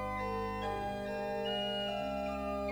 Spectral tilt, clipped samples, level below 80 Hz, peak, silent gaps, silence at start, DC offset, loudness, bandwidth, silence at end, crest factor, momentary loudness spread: -5.5 dB/octave; under 0.1%; -52 dBFS; -26 dBFS; none; 0 s; under 0.1%; -37 LUFS; over 20 kHz; 0 s; 12 dB; 3 LU